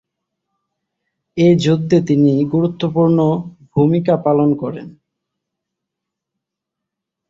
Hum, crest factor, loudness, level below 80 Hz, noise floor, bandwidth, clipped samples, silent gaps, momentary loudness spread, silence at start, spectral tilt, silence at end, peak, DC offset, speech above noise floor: none; 16 dB; -15 LUFS; -56 dBFS; -81 dBFS; 7.6 kHz; under 0.1%; none; 10 LU; 1.35 s; -8 dB/octave; 2.4 s; -2 dBFS; under 0.1%; 67 dB